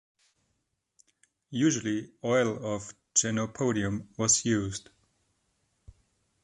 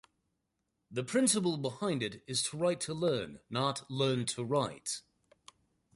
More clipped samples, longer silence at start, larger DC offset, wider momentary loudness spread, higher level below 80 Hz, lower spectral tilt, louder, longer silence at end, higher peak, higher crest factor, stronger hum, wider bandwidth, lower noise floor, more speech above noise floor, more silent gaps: neither; first, 1.5 s vs 0.9 s; neither; about the same, 12 LU vs 10 LU; first, -60 dBFS vs -70 dBFS; about the same, -4 dB/octave vs -4 dB/octave; first, -28 LUFS vs -33 LUFS; first, 1.65 s vs 0.95 s; first, -10 dBFS vs -14 dBFS; about the same, 22 dB vs 20 dB; neither; about the same, 11.5 kHz vs 12 kHz; second, -79 dBFS vs -83 dBFS; about the same, 50 dB vs 50 dB; neither